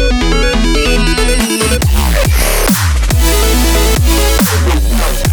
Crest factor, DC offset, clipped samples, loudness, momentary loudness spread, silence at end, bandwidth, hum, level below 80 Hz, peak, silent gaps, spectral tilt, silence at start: 10 dB; under 0.1%; under 0.1%; -11 LUFS; 2 LU; 0 s; over 20 kHz; none; -12 dBFS; 0 dBFS; none; -4 dB/octave; 0 s